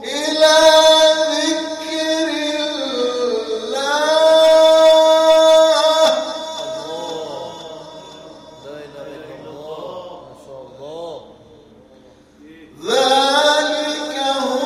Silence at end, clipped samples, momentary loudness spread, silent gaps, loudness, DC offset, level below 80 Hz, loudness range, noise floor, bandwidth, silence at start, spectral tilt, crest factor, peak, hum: 0 s; under 0.1%; 24 LU; none; -14 LUFS; under 0.1%; -58 dBFS; 22 LU; -47 dBFS; 14 kHz; 0 s; -1.5 dB/octave; 16 dB; 0 dBFS; none